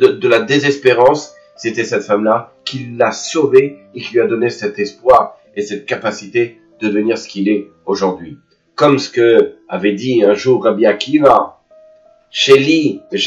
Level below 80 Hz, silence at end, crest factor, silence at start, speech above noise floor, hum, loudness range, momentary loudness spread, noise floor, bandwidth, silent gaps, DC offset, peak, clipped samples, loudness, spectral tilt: -56 dBFS; 0 s; 14 dB; 0 s; 33 dB; none; 4 LU; 13 LU; -47 dBFS; 8.2 kHz; none; under 0.1%; 0 dBFS; 0.2%; -14 LUFS; -5 dB/octave